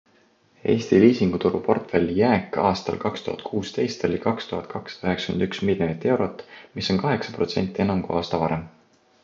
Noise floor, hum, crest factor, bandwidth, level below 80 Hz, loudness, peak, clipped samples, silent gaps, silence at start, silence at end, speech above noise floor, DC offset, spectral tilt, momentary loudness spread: -60 dBFS; none; 20 dB; 7.6 kHz; -50 dBFS; -23 LUFS; -4 dBFS; under 0.1%; none; 0.65 s; 0.55 s; 37 dB; under 0.1%; -6.5 dB/octave; 10 LU